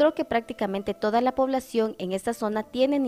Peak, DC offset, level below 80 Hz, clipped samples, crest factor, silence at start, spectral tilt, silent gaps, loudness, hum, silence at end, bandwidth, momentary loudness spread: -10 dBFS; under 0.1%; -58 dBFS; under 0.1%; 16 dB; 0 s; -5.5 dB/octave; none; -26 LUFS; none; 0 s; 15.5 kHz; 6 LU